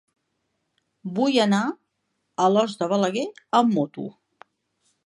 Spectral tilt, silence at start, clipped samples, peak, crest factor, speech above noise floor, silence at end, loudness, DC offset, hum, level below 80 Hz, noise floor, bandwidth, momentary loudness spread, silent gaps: -5.5 dB/octave; 1.05 s; under 0.1%; -4 dBFS; 20 dB; 54 dB; 0.95 s; -23 LUFS; under 0.1%; none; -76 dBFS; -76 dBFS; 11.5 kHz; 17 LU; none